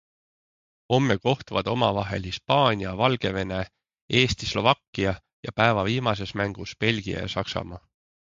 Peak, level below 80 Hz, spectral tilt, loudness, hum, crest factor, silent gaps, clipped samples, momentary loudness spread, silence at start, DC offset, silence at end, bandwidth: -2 dBFS; -48 dBFS; -5.5 dB/octave; -25 LUFS; none; 24 dB; 4.01-4.08 s, 4.88-4.93 s, 5.33-5.43 s; under 0.1%; 10 LU; 0.9 s; under 0.1%; 0.6 s; 7.6 kHz